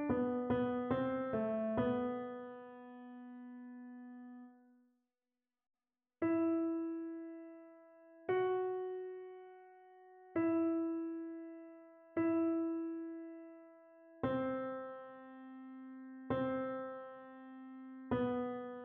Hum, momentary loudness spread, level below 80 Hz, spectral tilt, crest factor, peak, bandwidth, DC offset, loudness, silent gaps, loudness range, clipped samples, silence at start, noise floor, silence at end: none; 19 LU; -72 dBFS; -6.5 dB/octave; 18 dB; -22 dBFS; 3.7 kHz; under 0.1%; -39 LUFS; none; 6 LU; under 0.1%; 0 s; under -90 dBFS; 0 s